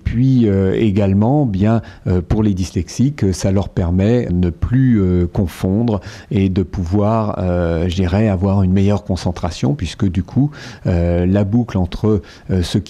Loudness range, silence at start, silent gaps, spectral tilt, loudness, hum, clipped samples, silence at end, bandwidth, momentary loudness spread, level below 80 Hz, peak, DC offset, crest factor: 2 LU; 0.05 s; none; -8 dB/octave; -17 LUFS; none; under 0.1%; 0 s; 12 kHz; 6 LU; -32 dBFS; -4 dBFS; under 0.1%; 12 dB